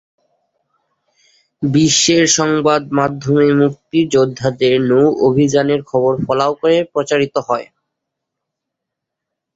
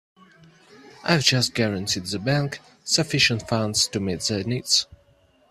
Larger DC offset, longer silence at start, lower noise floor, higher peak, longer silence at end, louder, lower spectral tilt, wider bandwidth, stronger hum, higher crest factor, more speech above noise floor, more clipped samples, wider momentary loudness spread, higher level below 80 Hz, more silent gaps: neither; first, 1.6 s vs 0.75 s; first, -80 dBFS vs -59 dBFS; about the same, 0 dBFS vs -2 dBFS; first, 1.9 s vs 0.55 s; first, -14 LUFS vs -22 LUFS; about the same, -4.5 dB/octave vs -3.5 dB/octave; second, 8 kHz vs 14.5 kHz; neither; second, 16 dB vs 22 dB; first, 66 dB vs 36 dB; neither; about the same, 7 LU vs 8 LU; about the same, -52 dBFS vs -56 dBFS; neither